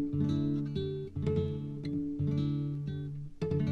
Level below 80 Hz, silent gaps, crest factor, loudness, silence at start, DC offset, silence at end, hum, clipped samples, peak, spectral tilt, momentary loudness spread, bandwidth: -52 dBFS; none; 14 dB; -34 LUFS; 0 s; under 0.1%; 0 s; none; under 0.1%; -20 dBFS; -9.5 dB/octave; 7 LU; 6.2 kHz